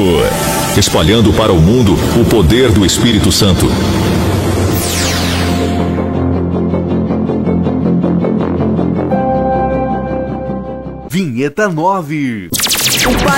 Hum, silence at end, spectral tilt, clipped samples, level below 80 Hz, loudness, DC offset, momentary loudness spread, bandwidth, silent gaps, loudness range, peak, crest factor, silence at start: none; 0 s; -5 dB/octave; under 0.1%; -26 dBFS; -12 LUFS; 0.3%; 8 LU; 16.5 kHz; none; 6 LU; 0 dBFS; 12 dB; 0 s